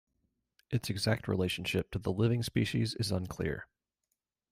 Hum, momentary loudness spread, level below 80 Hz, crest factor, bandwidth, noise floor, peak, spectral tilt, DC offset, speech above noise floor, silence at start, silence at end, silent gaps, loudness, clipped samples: none; 6 LU; -58 dBFS; 18 dB; 16 kHz; -85 dBFS; -16 dBFS; -5.5 dB/octave; under 0.1%; 53 dB; 0.7 s; 0.85 s; none; -33 LUFS; under 0.1%